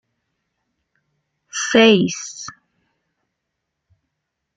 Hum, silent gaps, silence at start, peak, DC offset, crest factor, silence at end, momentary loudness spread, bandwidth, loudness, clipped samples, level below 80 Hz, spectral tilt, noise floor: none; none; 1.55 s; -2 dBFS; under 0.1%; 20 dB; 2.05 s; 21 LU; 9.4 kHz; -15 LUFS; under 0.1%; -64 dBFS; -3.5 dB/octave; -78 dBFS